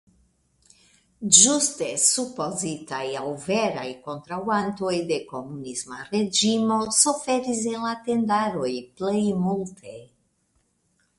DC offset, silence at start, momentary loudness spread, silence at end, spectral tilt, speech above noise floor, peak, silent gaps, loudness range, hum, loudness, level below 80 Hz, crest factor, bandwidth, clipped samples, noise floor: under 0.1%; 1.2 s; 15 LU; 1.15 s; -2.5 dB/octave; 45 dB; 0 dBFS; none; 7 LU; none; -23 LUFS; -64 dBFS; 26 dB; 11.5 kHz; under 0.1%; -69 dBFS